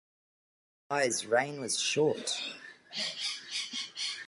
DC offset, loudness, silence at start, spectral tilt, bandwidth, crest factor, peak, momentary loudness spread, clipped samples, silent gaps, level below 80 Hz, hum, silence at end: under 0.1%; -32 LUFS; 0.9 s; -2 dB/octave; 11.5 kHz; 20 dB; -14 dBFS; 8 LU; under 0.1%; none; -82 dBFS; none; 0 s